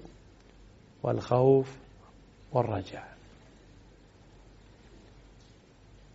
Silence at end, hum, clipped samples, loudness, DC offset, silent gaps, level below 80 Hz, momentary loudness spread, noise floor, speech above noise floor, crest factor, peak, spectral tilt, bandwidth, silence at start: 3.05 s; none; under 0.1%; -28 LUFS; under 0.1%; none; -58 dBFS; 27 LU; -56 dBFS; 30 dB; 22 dB; -10 dBFS; -8 dB/octave; 7.6 kHz; 0 s